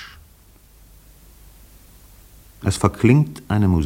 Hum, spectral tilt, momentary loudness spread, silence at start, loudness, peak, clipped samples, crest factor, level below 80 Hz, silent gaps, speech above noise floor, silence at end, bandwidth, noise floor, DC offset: none; -7 dB/octave; 11 LU; 0 s; -19 LUFS; 0 dBFS; under 0.1%; 22 dB; -42 dBFS; none; 33 dB; 0 s; 17 kHz; -50 dBFS; under 0.1%